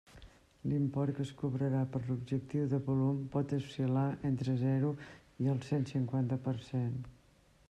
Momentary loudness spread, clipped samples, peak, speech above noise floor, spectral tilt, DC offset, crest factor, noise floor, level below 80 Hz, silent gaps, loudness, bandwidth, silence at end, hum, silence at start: 5 LU; under 0.1%; -22 dBFS; 32 dB; -9 dB/octave; under 0.1%; 12 dB; -66 dBFS; -64 dBFS; none; -35 LUFS; 9 kHz; 0.55 s; none; 0.15 s